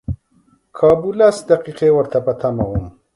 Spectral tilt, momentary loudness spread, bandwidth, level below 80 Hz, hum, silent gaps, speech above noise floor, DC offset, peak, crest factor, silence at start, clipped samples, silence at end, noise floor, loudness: -7 dB/octave; 11 LU; 11.5 kHz; -38 dBFS; none; none; 42 dB; under 0.1%; 0 dBFS; 16 dB; 0.1 s; under 0.1%; 0.25 s; -57 dBFS; -16 LUFS